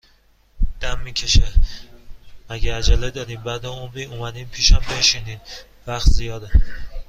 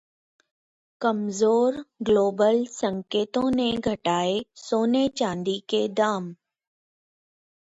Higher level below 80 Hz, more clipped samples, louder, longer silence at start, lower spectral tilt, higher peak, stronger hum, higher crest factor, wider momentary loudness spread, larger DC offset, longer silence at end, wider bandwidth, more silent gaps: first, -20 dBFS vs -60 dBFS; neither; first, -21 LUFS vs -24 LUFS; second, 0.6 s vs 1 s; second, -3 dB/octave vs -5 dB/octave; first, -2 dBFS vs -8 dBFS; neither; about the same, 18 dB vs 16 dB; first, 16 LU vs 8 LU; neither; second, 0.05 s vs 1.4 s; about the same, 8.4 kHz vs 8 kHz; neither